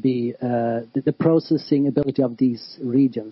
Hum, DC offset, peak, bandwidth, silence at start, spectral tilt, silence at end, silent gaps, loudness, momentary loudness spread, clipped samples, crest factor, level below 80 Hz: none; under 0.1%; -6 dBFS; 5.8 kHz; 0.05 s; -11 dB/octave; 0 s; none; -21 LUFS; 5 LU; under 0.1%; 14 dB; -60 dBFS